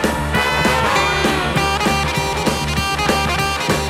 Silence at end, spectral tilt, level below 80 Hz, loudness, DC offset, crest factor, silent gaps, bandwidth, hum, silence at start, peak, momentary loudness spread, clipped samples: 0 s; -4 dB/octave; -30 dBFS; -17 LUFS; under 0.1%; 14 dB; none; 16.5 kHz; none; 0 s; -2 dBFS; 3 LU; under 0.1%